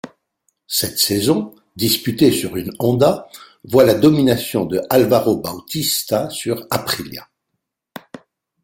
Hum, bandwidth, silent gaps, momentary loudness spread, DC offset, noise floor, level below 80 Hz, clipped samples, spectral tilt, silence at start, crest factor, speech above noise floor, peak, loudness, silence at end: none; 17 kHz; none; 12 LU; under 0.1%; -76 dBFS; -52 dBFS; under 0.1%; -4.5 dB/octave; 0.05 s; 18 dB; 59 dB; -2 dBFS; -17 LUFS; 0.45 s